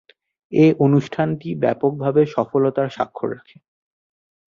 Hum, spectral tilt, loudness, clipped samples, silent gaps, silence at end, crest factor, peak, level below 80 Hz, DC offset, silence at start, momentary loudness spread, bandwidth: none; -9 dB/octave; -19 LUFS; under 0.1%; none; 1.1 s; 18 dB; -4 dBFS; -60 dBFS; under 0.1%; 0.5 s; 10 LU; 7.2 kHz